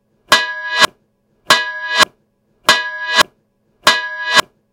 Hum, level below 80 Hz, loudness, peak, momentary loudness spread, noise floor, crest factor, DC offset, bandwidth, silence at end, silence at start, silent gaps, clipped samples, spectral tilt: none; -64 dBFS; -14 LUFS; 0 dBFS; 4 LU; -61 dBFS; 16 dB; under 0.1%; over 20 kHz; 0.3 s; 0.3 s; none; 0.2%; 0 dB/octave